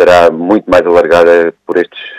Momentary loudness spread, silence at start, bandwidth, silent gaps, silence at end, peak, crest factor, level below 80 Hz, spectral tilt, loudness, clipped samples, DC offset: 8 LU; 0 s; 11.5 kHz; none; 0 s; 0 dBFS; 8 dB; -42 dBFS; -5.5 dB/octave; -8 LUFS; 3%; under 0.1%